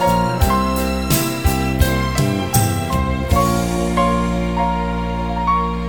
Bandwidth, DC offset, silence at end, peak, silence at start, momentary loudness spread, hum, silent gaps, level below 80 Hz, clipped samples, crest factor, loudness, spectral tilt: 19 kHz; 0.6%; 0 s; -2 dBFS; 0 s; 3 LU; none; none; -24 dBFS; under 0.1%; 16 dB; -18 LUFS; -5.5 dB/octave